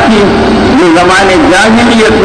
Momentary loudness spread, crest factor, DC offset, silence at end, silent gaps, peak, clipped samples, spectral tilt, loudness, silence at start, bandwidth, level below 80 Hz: 2 LU; 4 dB; under 0.1%; 0 s; none; 0 dBFS; under 0.1%; -4.5 dB/octave; -5 LUFS; 0 s; 10.5 kHz; -24 dBFS